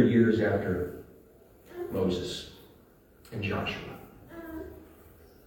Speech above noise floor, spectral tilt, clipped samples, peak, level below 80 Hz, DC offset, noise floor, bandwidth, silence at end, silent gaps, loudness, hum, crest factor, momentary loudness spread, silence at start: 27 dB; -7 dB/octave; under 0.1%; -10 dBFS; -58 dBFS; under 0.1%; -58 dBFS; 18 kHz; 0.6 s; none; -30 LUFS; none; 20 dB; 23 LU; 0 s